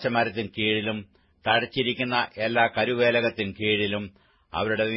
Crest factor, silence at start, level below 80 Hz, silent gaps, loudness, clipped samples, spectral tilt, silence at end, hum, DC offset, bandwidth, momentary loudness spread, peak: 20 dB; 0 s; -60 dBFS; none; -25 LUFS; under 0.1%; -9.5 dB/octave; 0 s; none; under 0.1%; 5.8 kHz; 10 LU; -6 dBFS